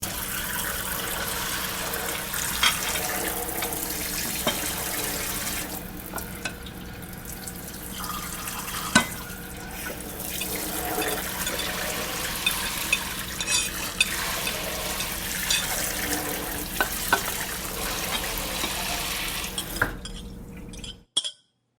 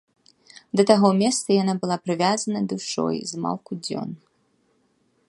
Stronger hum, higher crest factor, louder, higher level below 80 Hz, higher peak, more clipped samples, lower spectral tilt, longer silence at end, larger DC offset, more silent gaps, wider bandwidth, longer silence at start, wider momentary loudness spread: neither; first, 28 dB vs 22 dB; second, -27 LUFS vs -23 LUFS; first, -44 dBFS vs -68 dBFS; about the same, -2 dBFS vs 0 dBFS; neither; second, -1.5 dB/octave vs -5 dB/octave; second, 0.45 s vs 1.1 s; neither; neither; first, over 20 kHz vs 11.5 kHz; second, 0 s vs 0.75 s; about the same, 12 LU vs 13 LU